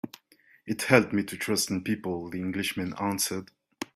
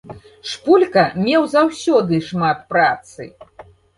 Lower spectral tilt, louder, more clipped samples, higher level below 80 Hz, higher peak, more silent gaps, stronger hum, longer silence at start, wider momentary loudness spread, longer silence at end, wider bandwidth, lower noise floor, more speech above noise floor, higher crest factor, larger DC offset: second, -4 dB/octave vs -5.5 dB/octave; second, -28 LUFS vs -16 LUFS; neither; second, -66 dBFS vs -54 dBFS; about the same, -4 dBFS vs -2 dBFS; neither; neither; about the same, 0.05 s vs 0.05 s; second, 15 LU vs 18 LU; second, 0.1 s vs 0.35 s; first, 16 kHz vs 11.5 kHz; first, -62 dBFS vs -44 dBFS; first, 34 dB vs 28 dB; first, 26 dB vs 16 dB; neither